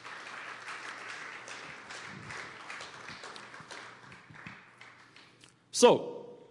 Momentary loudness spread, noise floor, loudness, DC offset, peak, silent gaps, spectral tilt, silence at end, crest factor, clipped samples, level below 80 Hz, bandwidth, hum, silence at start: 27 LU; -60 dBFS; -33 LUFS; under 0.1%; -8 dBFS; none; -3 dB/octave; 0.05 s; 26 dB; under 0.1%; -80 dBFS; 12 kHz; none; 0 s